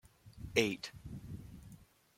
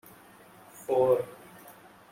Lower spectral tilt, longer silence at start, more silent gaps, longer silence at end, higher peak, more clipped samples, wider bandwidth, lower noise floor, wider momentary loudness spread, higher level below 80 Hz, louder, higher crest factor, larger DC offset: second, -4 dB/octave vs -6.5 dB/octave; second, 0.05 s vs 0.75 s; neither; about the same, 0.35 s vs 0.4 s; about the same, -12 dBFS vs -12 dBFS; neither; about the same, 16.5 kHz vs 16.5 kHz; first, -59 dBFS vs -54 dBFS; second, 22 LU vs 26 LU; first, -60 dBFS vs -70 dBFS; second, -37 LUFS vs -27 LUFS; first, 28 dB vs 18 dB; neither